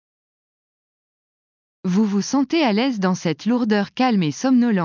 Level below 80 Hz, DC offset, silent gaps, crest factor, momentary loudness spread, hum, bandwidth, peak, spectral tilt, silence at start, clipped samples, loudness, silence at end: -70 dBFS; under 0.1%; none; 14 dB; 4 LU; none; 7.4 kHz; -6 dBFS; -6 dB/octave; 1.85 s; under 0.1%; -20 LUFS; 0 s